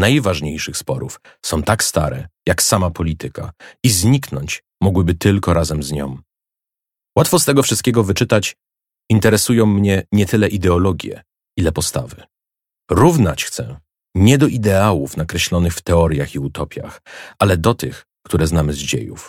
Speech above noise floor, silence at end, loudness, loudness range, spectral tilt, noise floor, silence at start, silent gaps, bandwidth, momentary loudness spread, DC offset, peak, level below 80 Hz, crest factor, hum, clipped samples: 71 dB; 0 s; -16 LUFS; 3 LU; -5 dB/octave; -87 dBFS; 0 s; none; 17 kHz; 14 LU; under 0.1%; 0 dBFS; -34 dBFS; 16 dB; none; under 0.1%